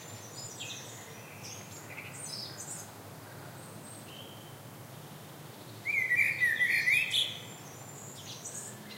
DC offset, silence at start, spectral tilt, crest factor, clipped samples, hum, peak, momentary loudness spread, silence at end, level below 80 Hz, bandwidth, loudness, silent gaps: under 0.1%; 0 s; -1.5 dB/octave; 22 dB; under 0.1%; none; -16 dBFS; 22 LU; 0 s; -78 dBFS; 16 kHz; -31 LUFS; none